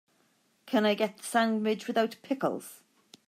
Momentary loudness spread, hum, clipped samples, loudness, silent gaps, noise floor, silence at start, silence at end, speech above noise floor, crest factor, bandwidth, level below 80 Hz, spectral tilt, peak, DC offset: 6 LU; none; under 0.1%; -29 LUFS; none; -70 dBFS; 0.65 s; 0.5 s; 41 dB; 16 dB; 15.5 kHz; -86 dBFS; -4.5 dB/octave; -14 dBFS; under 0.1%